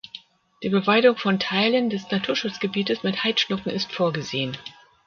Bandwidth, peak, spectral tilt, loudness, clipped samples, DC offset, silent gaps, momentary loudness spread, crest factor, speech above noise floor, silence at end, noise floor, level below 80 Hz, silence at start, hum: 7 kHz; -4 dBFS; -5 dB/octave; -23 LUFS; under 0.1%; under 0.1%; none; 13 LU; 20 dB; 23 dB; 0.35 s; -46 dBFS; -64 dBFS; 0.15 s; none